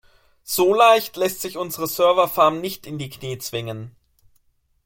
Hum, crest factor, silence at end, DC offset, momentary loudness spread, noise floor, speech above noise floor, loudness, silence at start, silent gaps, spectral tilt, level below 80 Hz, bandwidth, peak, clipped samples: none; 20 dB; 0.95 s; under 0.1%; 16 LU; -63 dBFS; 43 dB; -20 LUFS; 0.45 s; none; -4 dB/octave; -58 dBFS; 17 kHz; -2 dBFS; under 0.1%